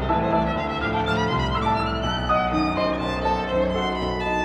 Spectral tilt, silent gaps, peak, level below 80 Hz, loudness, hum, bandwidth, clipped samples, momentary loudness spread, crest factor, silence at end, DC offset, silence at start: -6.5 dB/octave; none; -10 dBFS; -34 dBFS; -23 LUFS; none; 10.5 kHz; under 0.1%; 3 LU; 14 dB; 0 s; under 0.1%; 0 s